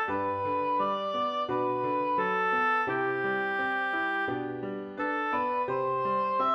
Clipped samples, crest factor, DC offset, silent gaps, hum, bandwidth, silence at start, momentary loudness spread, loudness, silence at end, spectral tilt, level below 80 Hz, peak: under 0.1%; 12 dB; under 0.1%; none; none; 7.8 kHz; 0 s; 5 LU; -29 LUFS; 0 s; -6.5 dB/octave; -70 dBFS; -18 dBFS